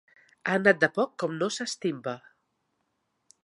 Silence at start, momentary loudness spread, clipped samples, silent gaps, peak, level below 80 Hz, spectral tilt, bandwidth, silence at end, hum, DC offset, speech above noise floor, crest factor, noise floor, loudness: 0.45 s; 14 LU; under 0.1%; none; -6 dBFS; -74 dBFS; -4.5 dB/octave; 11.5 kHz; 1.25 s; none; under 0.1%; 50 dB; 24 dB; -77 dBFS; -27 LUFS